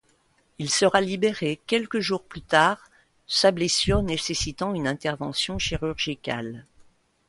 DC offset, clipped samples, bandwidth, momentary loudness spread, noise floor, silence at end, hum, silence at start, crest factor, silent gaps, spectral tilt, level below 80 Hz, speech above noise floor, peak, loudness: under 0.1%; under 0.1%; 11.5 kHz; 11 LU; -65 dBFS; 0.45 s; none; 0.6 s; 20 dB; none; -3.5 dB/octave; -44 dBFS; 40 dB; -4 dBFS; -24 LUFS